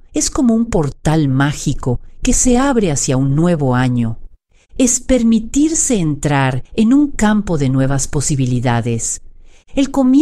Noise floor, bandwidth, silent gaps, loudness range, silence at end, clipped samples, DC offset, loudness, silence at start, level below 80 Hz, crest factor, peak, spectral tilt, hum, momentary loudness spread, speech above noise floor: -44 dBFS; 13.5 kHz; none; 2 LU; 0 s; under 0.1%; under 0.1%; -15 LUFS; 0.1 s; -28 dBFS; 14 dB; -2 dBFS; -5 dB/octave; none; 7 LU; 30 dB